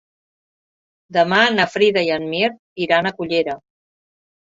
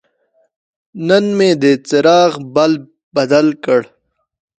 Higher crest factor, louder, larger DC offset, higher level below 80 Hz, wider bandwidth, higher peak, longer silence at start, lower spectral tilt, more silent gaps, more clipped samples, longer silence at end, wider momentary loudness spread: about the same, 18 dB vs 14 dB; second, -18 LUFS vs -13 LUFS; neither; about the same, -62 dBFS vs -62 dBFS; second, 7.8 kHz vs 9.2 kHz; about the same, -2 dBFS vs 0 dBFS; first, 1.1 s vs 0.95 s; about the same, -5 dB/octave vs -5.5 dB/octave; first, 2.59-2.76 s vs 3.03-3.11 s; neither; first, 0.95 s vs 0.75 s; about the same, 10 LU vs 8 LU